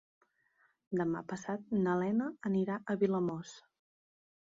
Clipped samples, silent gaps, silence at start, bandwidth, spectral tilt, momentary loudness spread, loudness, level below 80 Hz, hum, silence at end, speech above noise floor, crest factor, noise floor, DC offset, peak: under 0.1%; none; 0.9 s; 7.8 kHz; -7.5 dB/octave; 8 LU; -35 LUFS; -76 dBFS; none; 0.85 s; 39 dB; 18 dB; -73 dBFS; under 0.1%; -18 dBFS